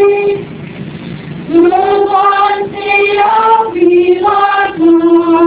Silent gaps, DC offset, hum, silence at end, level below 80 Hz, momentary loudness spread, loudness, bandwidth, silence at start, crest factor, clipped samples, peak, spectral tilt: none; under 0.1%; none; 0 s; -46 dBFS; 16 LU; -9 LUFS; 4 kHz; 0 s; 10 dB; 0.3%; 0 dBFS; -9.5 dB/octave